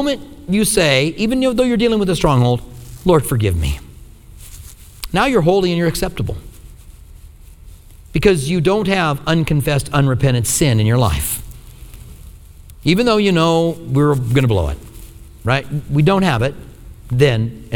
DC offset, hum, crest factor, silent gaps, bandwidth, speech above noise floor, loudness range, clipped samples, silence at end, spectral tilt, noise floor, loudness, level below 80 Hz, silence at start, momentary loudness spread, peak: under 0.1%; none; 16 dB; none; over 20 kHz; 24 dB; 4 LU; under 0.1%; 0 s; -5.5 dB/octave; -39 dBFS; -16 LUFS; -32 dBFS; 0 s; 11 LU; 0 dBFS